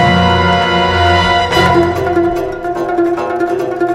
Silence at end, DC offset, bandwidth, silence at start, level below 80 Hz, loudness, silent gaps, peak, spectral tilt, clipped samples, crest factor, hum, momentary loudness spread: 0 s; under 0.1%; 14.5 kHz; 0 s; -32 dBFS; -12 LUFS; none; 0 dBFS; -6 dB/octave; under 0.1%; 12 dB; none; 6 LU